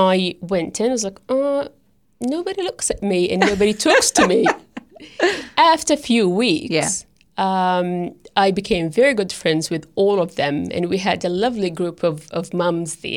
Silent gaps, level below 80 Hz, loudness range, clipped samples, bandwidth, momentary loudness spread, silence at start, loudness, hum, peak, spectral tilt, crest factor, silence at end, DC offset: none; -50 dBFS; 4 LU; under 0.1%; 17 kHz; 10 LU; 0 s; -19 LUFS; none; -2 dBFS; -4 dB/octave; 18 dB; 0 s; under 0.1%